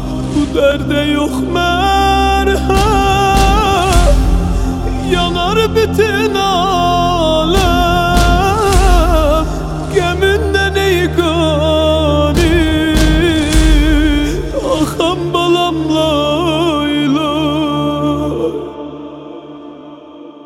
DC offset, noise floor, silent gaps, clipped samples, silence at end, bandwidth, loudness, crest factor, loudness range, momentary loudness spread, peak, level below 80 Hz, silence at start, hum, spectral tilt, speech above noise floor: under 0.1%; -34 dBFS; none; under 0.1%; 0 s; 16 kHz; -13 LUFS; 12 dB; 3 LU; 6 LU; 0 dBFS; -18 dBFS; 0 s; none; -5.5 dB/octave; 22 dB